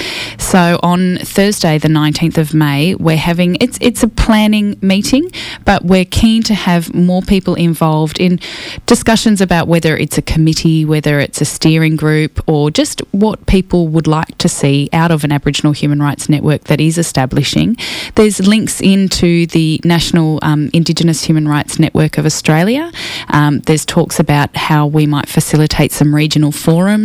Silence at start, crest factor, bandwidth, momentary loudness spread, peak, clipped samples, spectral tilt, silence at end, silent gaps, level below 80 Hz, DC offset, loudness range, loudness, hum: 0 s; 10 dB; 15.5 kHz; 4 LU; 0 dBFS; under 0.1%; -5.5 dB/octave; 0 s; none; -30 dBFS; under 0.1%; 1 LU; -12 LUFS; none